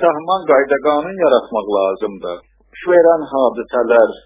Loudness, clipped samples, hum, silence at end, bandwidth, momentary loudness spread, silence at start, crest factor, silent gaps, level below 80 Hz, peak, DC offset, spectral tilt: -15 LUFS; under 0.1%; none; 0.1 s; 3.9 kHz; 13 LU; 0 s; 14 dB; none; -54 dBFS; 0 dBFS; under 0.1%; -9 dB/octave